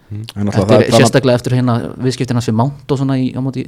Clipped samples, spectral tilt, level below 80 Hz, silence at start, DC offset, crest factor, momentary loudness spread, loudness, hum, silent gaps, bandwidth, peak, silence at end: 0.3%; -6 dB/octave; -44 dBFS; 0.1 s; under 0.1%; 14 dB; 9 LU; -14 LUFS; none; none; 14.5 kHz; 0 dBFS; 0 s